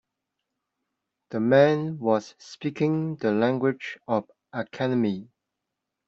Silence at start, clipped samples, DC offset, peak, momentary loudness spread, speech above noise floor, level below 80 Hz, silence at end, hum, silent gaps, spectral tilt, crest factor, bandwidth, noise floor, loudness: 1.3 s; under 0.1%; under 0.1%; -6 dBFS; 16 LU; 60 dB; -70 dBFS; 0.85 s; none; none; -7.5 dB/octave; 20 dB; 7.6 kHz; -84 dBFS; -25 LUFS